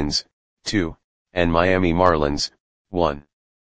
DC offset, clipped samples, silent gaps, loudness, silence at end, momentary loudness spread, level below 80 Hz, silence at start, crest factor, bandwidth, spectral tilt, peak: under 0.1%; under 0.1%; 0.33-0.57 s, 1.04-1.26 s, 2.60-2.85 s; -21 LUFS; 0.4 s; 12 LU; -40 dBFS; 0 s; 22 dB; 9.8 kHz; -5 dB/octave; 0 dBFS